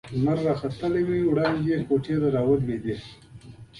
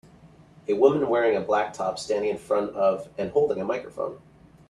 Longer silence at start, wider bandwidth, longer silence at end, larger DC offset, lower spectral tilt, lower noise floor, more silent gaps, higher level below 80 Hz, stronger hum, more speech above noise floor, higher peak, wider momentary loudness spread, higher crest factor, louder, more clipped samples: second, 0.05 s vs 0.7 s; about the same, 11.5 kHz vs 11.5 kHz; second, 0 s vs 0.55 s; neither; first, -8.5 dB/octave vs -5.5 dB/octave; second, -45 dBFS vs -52 dBFS; neither; first, -52 dBFS vs -62 dBFS; neither; second, 21 dB vs 28 dB; second, -10 dBFS vs -4 dBFS; second, 8 LU vs 11 LU; about the same, 16 dB vs 20 dB; about the same, -25 LUFS vs -25 LUFS; neither